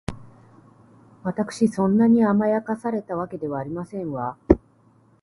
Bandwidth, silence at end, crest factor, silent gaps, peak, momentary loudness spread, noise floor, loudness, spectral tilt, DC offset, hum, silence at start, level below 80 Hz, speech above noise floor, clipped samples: 11.5 kHz; 0.65 s; 24 dB; none; 0 dBFS; 13 LU; -57 dBFS; -23 LUFS; -8 dB/octave; under 0.1%; none; 0.1 s; -42 dBFS; 36 dB; under 0.1%